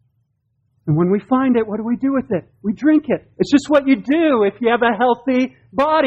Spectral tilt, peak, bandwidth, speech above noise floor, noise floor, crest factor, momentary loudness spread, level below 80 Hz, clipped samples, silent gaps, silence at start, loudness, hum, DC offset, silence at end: -7 dB/octave; -2 dBFS; 8.6 kHz; 50 dB; -67 dBFS; 16 dB; 8 LU; -54 dBFS; under 0.1%; none; 0.85 s; -17 LUFS; none; under 0.1%; 0 s